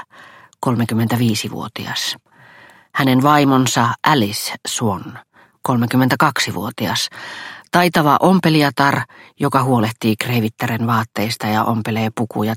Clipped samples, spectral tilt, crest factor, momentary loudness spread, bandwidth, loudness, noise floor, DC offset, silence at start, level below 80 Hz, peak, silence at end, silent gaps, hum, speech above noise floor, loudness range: under 0.1%; -5 dB/octave; 18 dB; 11 LU; 16.5 kHz; -17 LUFS; -45 dBFS; under 0.1%; 0 s; -56 dBFS; 0 dBFS; 0 s; none; none; 28 dB; 3 LU